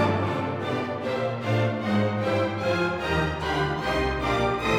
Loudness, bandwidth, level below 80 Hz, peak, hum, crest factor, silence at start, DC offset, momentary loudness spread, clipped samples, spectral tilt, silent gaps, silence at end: -26 LUFS; 14.5 kHz; -42 dBFS; -10 dBFS; none; 16 dB; 0 s; under 0.1%; 4 LU; under 0.1%; -6.5 dB/octave; none; 0 s